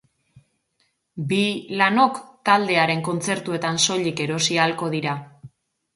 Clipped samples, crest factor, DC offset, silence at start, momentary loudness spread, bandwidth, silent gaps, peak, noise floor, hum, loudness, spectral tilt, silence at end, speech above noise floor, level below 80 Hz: under 0.1%; 20 dB; under 0.1%; 1.15 s; 9 LU; 11.5 kHz; none; -4 dBFS; -70 dBFS; none; -21 LUFS; -3.5 dB/octave; 0.5 s; 48 dB; -66 dBFS